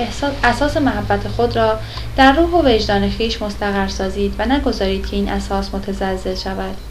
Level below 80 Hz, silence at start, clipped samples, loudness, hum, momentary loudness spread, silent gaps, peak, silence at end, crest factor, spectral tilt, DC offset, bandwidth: -28 dBFS; 0 s; under 0.1%; -17 LUFS; none; 9 LU; none; 0 dBFS; 0 s; 18 dB; -5.5 dB/octave; under 0.1%; 14.5 kHz